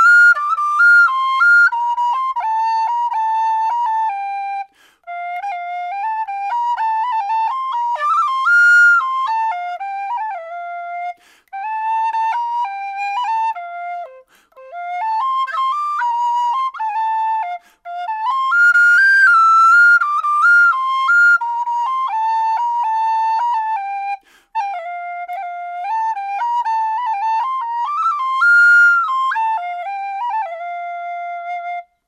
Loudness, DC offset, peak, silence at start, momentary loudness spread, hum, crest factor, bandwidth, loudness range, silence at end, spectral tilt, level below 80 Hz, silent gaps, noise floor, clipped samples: -15 LUFS; under 0.1%; -4 dBFS; 0 s; 17 LU; none; 12 dB; 11 kHz; 11 LU; 0.25 s; 3 dB/octave; -74 dBFS; none; -44 dBFS; under 0.1%